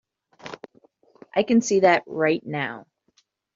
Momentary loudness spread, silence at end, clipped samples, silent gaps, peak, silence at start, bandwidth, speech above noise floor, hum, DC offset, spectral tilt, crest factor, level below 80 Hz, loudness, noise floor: 23 LU; 0.75 s; under 0.1%; none; -4 dBFS; 0.45 s; 7.8 kHz; 45 dB; none; under 0.1%; -4 dB/octave; 20 dB; -68 dBFS; -22 LUFS; -66 dBFS